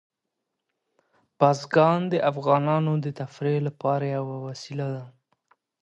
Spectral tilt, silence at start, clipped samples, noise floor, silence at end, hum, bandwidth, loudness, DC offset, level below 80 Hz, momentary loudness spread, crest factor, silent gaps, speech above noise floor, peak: -7.5 dB/octave; 1.4 s; under 0.1%; -82 dBFS; 0.75 s; none; 8.2 kHz; -25 LUFS; under 0.1%; -72 dBFS; 13 LU; 22 dB; none; 58 dB; -4 dBFS